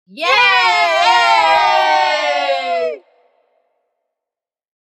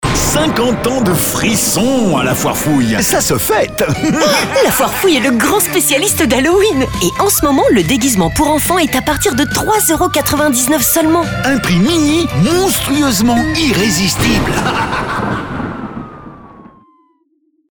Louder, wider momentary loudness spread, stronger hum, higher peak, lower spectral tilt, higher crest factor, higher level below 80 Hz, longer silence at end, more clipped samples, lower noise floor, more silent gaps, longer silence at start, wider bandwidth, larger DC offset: about the same, -12 LUFS vs -12 LUFS; first, 9 LU vs 4 LU; neither; about the same, 0 dBFS vs 0 dBFS; second, 0 dB/octave vs -4 dB/octave; about the same, 14 dB vs 12 dB; second, -60 dBFS vs -32 dBFS; first, 1.9 s vs 1.1 s; neither; first, -87 dBFS vs -58 dBFS; neither; first, 0.15 s vs 0 s; second, 12 kHz vs over 20 kHz; neither